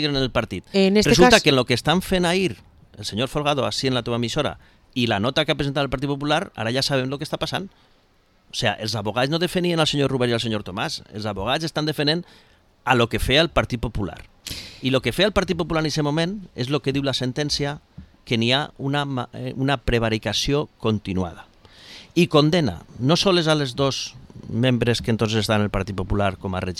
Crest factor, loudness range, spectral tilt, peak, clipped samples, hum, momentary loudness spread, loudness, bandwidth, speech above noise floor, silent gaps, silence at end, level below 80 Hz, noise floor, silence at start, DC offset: 22 dB; 5 LU; -5 dB/octave; 0 dBFS; under 0.1%; none; 11 LU; -22 LUFS; 15.5 kHz; 38 dB; none; 0 s; -40 dBFS; -59 dBFS; 0 s; under 0.1%